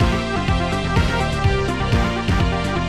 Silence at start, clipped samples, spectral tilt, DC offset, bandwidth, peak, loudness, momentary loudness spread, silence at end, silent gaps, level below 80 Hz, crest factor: 0 s; under 0.1%; -6 dB/octave; 0.6%; 13 kHz; -6 dBFS; -20 LUFS; 1 LU; 0 s; none; -26 dBFS; 12 dB